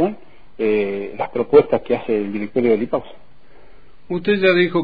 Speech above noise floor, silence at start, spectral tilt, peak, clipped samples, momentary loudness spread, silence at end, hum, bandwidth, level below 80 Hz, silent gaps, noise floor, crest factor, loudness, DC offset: 31 dB; 0 s; -9 dB/octave; -2 dBFS; under 0.1%; 11 LU; 0 s; none; 5 kHz; -52 dBFS; none; -49 dBFS; 18 dB; -19 LUFS; 1%